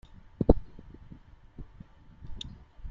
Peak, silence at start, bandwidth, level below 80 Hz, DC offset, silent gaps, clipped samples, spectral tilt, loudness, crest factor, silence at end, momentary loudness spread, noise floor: -4 dBFS; 0.4 s; 7.4 kHz; -36 dBFS; under 0.1%; none; under 0.1%; -8.5 dB/octave; -31 LUFS; 28 dB; 0 s; 27 LU; -52 dBFS